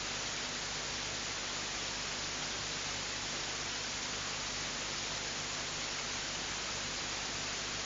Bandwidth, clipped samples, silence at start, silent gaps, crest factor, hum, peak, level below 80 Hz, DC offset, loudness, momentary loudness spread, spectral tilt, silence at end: 7.8 kHz; under 0.1%; 0 s; none; 14 dB; 50 Hz at -55 dBFS; -24 dBFS; -58 dBFS; under 0.1%; -36 LUFS; 0 LU; -1 dB/octave; 0 s